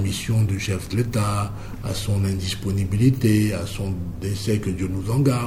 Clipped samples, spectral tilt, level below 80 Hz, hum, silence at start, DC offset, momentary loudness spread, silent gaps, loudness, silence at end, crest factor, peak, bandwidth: under 0.1%; -6 dB/octave; -38 dBFS; none; 0 s; under 0.1%; 9 LU; none; -23 LUFS; 0 s; 16 dB; -6 dBFS; 16 kHz